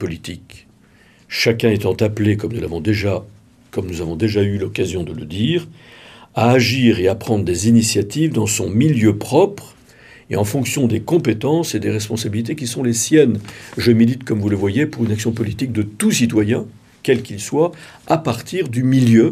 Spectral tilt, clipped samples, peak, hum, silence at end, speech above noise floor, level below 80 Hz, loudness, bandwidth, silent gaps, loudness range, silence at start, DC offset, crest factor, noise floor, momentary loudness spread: -5.5 dB/octave; under 0.1%; 0 dBFS; none; 0 s; 33 dB; -52 dBFS; -18 LUFS; 15.5 kHz; none; 4 LU; 0 s; under 0.1%; 18 dB; -50 dBFS; 12 LU